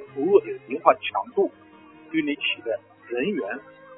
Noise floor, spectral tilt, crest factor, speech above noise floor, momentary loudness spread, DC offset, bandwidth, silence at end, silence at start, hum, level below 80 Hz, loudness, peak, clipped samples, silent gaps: -48 dBFS; -8.5 dB/octave; 24 dB; 24 dB; 12 LU; under 0.1%; 3.9 kHz; 0 s; 0 s; none; -72 dBFS; -25 LUFS; 0 dBFS; under 0.1%; none